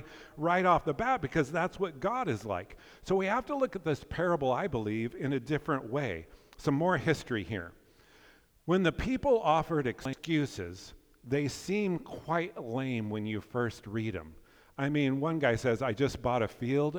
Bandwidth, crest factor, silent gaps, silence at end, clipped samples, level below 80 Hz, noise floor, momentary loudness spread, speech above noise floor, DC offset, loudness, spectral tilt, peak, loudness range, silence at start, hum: over 20 kHz; 18 dB; none; 0 s; under 0.1%; -54 dBFS; -61 dBFS; 10 LU; 30 dB; under 0.1%; -32 LUFS; -6.5 dB/octave; -12 dBFS; 3 LU; 0 s; none